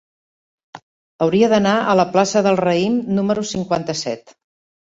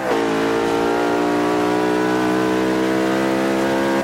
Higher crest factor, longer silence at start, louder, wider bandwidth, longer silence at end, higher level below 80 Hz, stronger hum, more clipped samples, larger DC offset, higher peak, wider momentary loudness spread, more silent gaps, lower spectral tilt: first, 16 dB vs 10 dB; first, 0.75 s vs 0 s; about the same, -17 LUFS vs -18 LUFS; second, 8 kHz vs 16.5 kHz; first, 0.65 s vs 0 s; second, -56 dBFS vs -50 dBFS; neither; neither; neither; first, -2 dBFS vs -8 dBFS; first, 9 LU vs 0 LU; first, 0.82-1.19 s vs none; about the same, -5.5 dB/octave vs -5 dB/octave